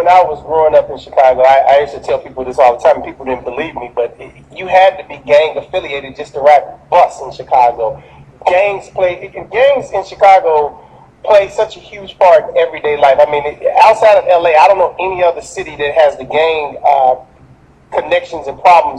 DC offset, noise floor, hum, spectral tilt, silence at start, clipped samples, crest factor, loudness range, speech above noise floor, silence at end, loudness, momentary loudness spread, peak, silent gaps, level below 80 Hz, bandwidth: under 0.1%; -43 dBFS; none; -4 dB/octave; 0 s; under 0.1%; 12 dB; 4 LU; 32 dB; 0 s; -11 LUFS; 13 LU; 0 dBFS; none; -46 dBFS; 9.6 kHz